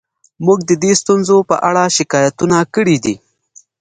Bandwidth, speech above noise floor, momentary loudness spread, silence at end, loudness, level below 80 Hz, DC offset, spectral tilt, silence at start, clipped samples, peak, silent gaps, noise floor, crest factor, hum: 9.6 kHz; 35 dB; 5 LU; 0.65 s; -13 LUFS; -54 dBFS; under 0.1%; -4.5 dB/octave; 0.4 s; under 0.1%; 0 dBFS; none; -48 dBFS; 14 dB; none